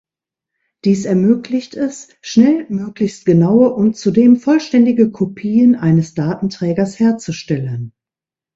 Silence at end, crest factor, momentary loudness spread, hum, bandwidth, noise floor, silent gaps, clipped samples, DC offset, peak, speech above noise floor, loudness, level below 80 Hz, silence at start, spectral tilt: 0.65 s; 14 dB; 11 LU; none; 8 kHz; -89 dBFS; none; under 0.1%; under 0.1%; 0 dBFS; 75 dB; -15 LUFS; -54 dBFS; 0.85 s; -7.5 dB/octave